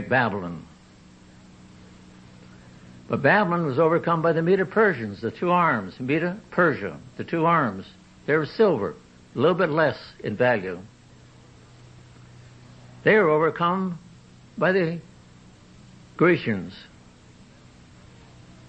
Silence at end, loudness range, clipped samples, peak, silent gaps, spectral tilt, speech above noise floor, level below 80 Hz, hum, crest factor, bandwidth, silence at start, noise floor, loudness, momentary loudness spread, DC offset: 1.85 s; 6 LU; under 0.1%; -6 dBFS; none; -7.5 dB/octave; 28 dB; -60 dBFS; none; 20 dB; 8.6 kHz; 0 s; -50 dBFS; -23 LUFS; 16 LU; under 0.1%